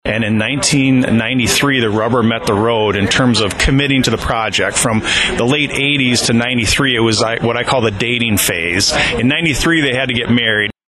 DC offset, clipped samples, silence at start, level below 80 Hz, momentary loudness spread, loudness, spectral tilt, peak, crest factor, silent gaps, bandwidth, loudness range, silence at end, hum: under 0.1%; under 0.1%; 0.05 s; -32 dBFS; 3 LU; -13 LUFS; -4 dB/octave; -2 dBFS; 12 dB; none; 13 kHz; 0 LU; 0.15 s; none